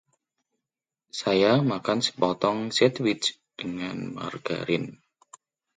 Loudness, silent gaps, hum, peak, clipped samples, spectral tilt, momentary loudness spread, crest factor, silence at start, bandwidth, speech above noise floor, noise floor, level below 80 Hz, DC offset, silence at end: -26 LUFS; none; none; -6 dBFS; under 0.1%; -5 dB/octave; 13 LU; 22 dB; 1.15 s; 9.6 kHz; 63 dB; -88 dBFS; -66 dBFS; under 0.1%; 0.8 s